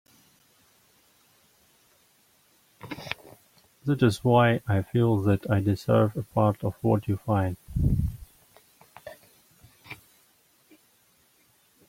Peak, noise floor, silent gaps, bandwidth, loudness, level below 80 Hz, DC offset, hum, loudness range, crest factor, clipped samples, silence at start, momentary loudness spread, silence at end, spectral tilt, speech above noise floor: -6 dBFS; -64 dBFS; none; 16.5 kHz; -26 LUFS; -46 dBFS; under 0.1%; none; 18 LU; 22 dB; under 0.1%; 2.85 s; 24 LU; 1.95 s; -7.5 dB/octave; 40 dB